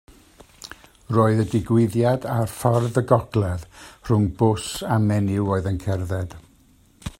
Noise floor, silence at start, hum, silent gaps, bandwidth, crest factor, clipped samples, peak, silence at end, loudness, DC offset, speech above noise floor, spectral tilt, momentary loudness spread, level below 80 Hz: -55 dBFS; 0.65 s; none; none; 16 kHz; 20 dB; under 0.1%; -2 dBFS; 0.1 s; -22 LUFS; under 0.1%; 35 dB; -7 dB/octave; 19 LU; -48 dBFS